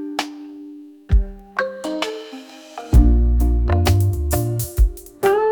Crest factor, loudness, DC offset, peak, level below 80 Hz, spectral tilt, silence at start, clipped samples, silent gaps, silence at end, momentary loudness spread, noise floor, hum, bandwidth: 16 dB; -20 LUFS; under 0.1%; -2 dBFS; -20 dBFS; -6 dB/octave; 0 s; under 0.1%; none; 0 s; 20 LU; -38 dBFS; none; 19.5 kHz